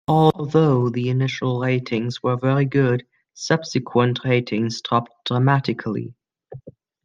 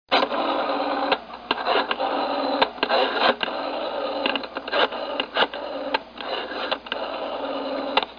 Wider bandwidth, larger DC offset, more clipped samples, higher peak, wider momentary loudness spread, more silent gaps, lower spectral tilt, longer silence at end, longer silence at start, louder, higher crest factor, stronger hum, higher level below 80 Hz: first, 7.4 kHz vs 5.2 kHz; neither; neither; about the same, -2 dBFS vs -2 dBFS; about the same, 8 LU vs 8 LU; neither; first, -7 dB/octave vs -4.5 dB/octave; first, 0.35 s vs 0 s; about the same, 0.1 s vs 0.1 s; first, -21 LUFS vs -24 LUFS; about the same, 18 dB vs 22 dB; neither; about the same, -58 dBFS vs -60 dBFS